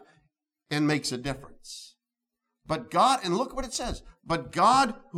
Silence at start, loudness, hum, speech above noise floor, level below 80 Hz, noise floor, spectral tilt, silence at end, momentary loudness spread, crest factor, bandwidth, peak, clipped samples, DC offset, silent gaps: 0.7 s; -26 LUFS; none; 60 dB; -50 dBFS; -87 dBFS; -4 dB/octave; 0 s; 20 LU; 20 dB; 16 kHz; -8 dBFS; under 0.1%; under 0.1%; none